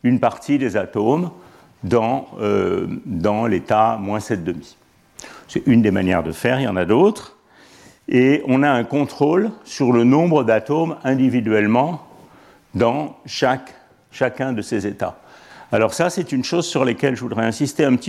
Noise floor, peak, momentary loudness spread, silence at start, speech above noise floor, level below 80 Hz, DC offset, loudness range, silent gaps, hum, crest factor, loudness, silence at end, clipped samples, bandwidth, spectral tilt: -48 dBFS; -2 dBFS; 10 LU; 0.05 s; 30 dB; -54 dBFS; under 0.1%; 5 LU; none; none; 16 dB; -19 LUFS; 0 s; under 0.1%; 13.5 kHz; -6.5 dB/octave